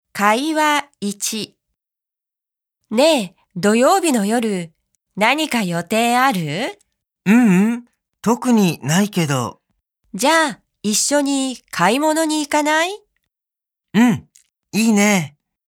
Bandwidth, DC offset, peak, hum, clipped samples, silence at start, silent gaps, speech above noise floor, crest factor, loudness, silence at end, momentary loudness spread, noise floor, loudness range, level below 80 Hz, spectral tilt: 17.5 kHz; under 0.1%; 0 dBFS; none; under 0.1%; 0.15 s; none; 71 dB; 18 dB; -17 LUFS; 0.4 s; 12 LU; -87 dBFS; 2 LU; -66 dBFS; -4 dB/octave